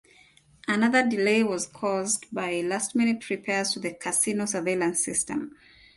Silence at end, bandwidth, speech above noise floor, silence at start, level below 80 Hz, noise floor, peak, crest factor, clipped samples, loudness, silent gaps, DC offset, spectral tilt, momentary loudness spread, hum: 0.5 s; 12 kHz; 32 dB; 0.7 s; -66 dBFS; -58 dBFS; -10 dBFS; 18 dB; under 0.1%; -26 LUFS; none; under 0.1%; -3 dB/octave; 8 LU; none